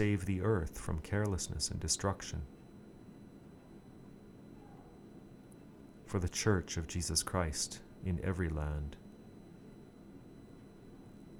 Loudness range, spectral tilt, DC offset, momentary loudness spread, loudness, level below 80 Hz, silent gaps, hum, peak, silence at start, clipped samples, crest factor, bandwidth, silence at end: 16 LU; -4.5 dB/octave; under 0.1%; 22 LU; -36 LUFS; -50 dBFS; none; none; -16 dBFS; 0 s; under 0.1%; 22 dB; 17.5 kHz; 0 s